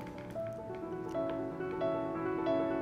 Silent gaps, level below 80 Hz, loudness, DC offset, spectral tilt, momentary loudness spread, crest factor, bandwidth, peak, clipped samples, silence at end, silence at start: none; -62 dBFS; -37 LUFS; under 0.1%; -8 dB/octave; 9 LU; 14 dB; 12 kHz; -22 dBFS; under 0.1%; 0 s; 0 s